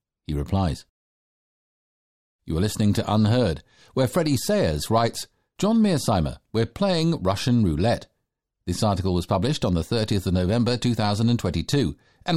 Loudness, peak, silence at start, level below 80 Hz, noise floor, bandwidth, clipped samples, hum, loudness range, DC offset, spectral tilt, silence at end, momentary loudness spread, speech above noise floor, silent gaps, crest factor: -23 LUFS; -10 dBFS; 0.3 s; -44 dBFS; -78 dBFS; 15.5 kHz; under 0.1%; none; 3 LU; 0.4%; -6 dB/octave; 0 s; 9 LU; 56 dB; 0.89-2.39 s; 14 dB